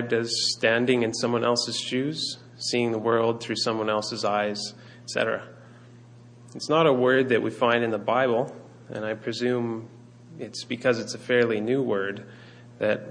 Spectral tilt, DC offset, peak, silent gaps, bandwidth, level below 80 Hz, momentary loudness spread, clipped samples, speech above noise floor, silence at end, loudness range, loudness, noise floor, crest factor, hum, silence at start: -4 dB/octave; under 0.1%; -6 dBFS; none; 10.5 kHz; -70 dBFS; 14 LU; under 0.1%; 24 dB; 0 s; 4 LU; -25 LUFS; -49 dBFS; 18 dB; none; 0 s